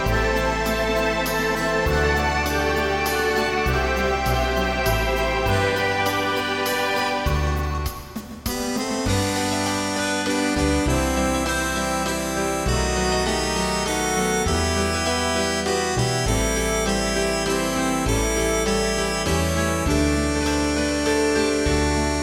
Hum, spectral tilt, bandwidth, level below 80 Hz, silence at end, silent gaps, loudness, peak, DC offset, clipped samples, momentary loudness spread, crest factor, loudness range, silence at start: none; -4 dB/octave; 16.5 kHz; -30 dBFS; 0 s; none; -22 LUFS; -8 dBFS; 0.1%; under 0.1%; 2 LU; 14 dB; 2 LU; 0 s